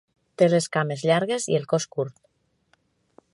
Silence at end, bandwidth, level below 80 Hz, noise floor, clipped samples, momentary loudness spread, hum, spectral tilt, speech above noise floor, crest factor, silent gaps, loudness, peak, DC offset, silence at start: 1.25 s; 11.5 kHz; -70 dBFS; -67 dBFS; under 0.1%; 10 LU; none; -5 dB/octave; 44 dB; 20 dB; none; -24 LUFS; -6 dBFS; under 0.1%; 0.4 s